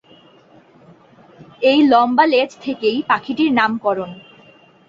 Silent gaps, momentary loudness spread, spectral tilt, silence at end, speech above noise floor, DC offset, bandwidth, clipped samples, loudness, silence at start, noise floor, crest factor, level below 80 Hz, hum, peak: none; 9 LU; -5.5 dB/octave; 0.7 s; 33 dB; under 0.1%; 7.4 kHz; under 0.1%; -16 LUFS; 1.6 s; -49 dBFS; 16 dB; -62 dBFS; none; -2 dBFS